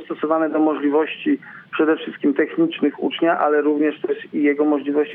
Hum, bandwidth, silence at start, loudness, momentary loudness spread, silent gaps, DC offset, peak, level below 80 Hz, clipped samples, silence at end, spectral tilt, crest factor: none; 3.8 kHz; 0 s; -20 LUFS; 5 LU; none; under 0.1%; -6 dBFS; -76 dBFS; under 0.1%; 0 s; -8.5 dB/octave; 14 dB